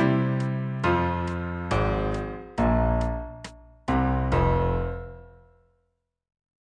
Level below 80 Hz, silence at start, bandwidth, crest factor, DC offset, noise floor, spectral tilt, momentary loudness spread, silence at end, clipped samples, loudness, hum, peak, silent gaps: -34 dBFS; 0 s; 9.6 kHz; 16 dB; under 0.1%; -75 dBFS; -8 dB/octave; 14 LU; 1.35 s; under 0.1%; -26 LUFS; none; -10 dBFS; none